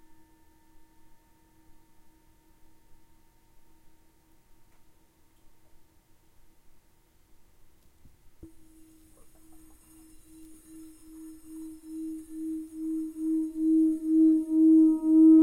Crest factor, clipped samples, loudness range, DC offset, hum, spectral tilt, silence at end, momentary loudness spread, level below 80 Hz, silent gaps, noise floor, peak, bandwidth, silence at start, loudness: 18 dB; under 0.1%; 28 LU; under 0.1%; none; -7.5 dB/octave; 0 s; 29 LU; -62 dBFS; none; -61 dBFS; -12 dBFS; 10.5 kHz; 10.4 s; -25 LUFS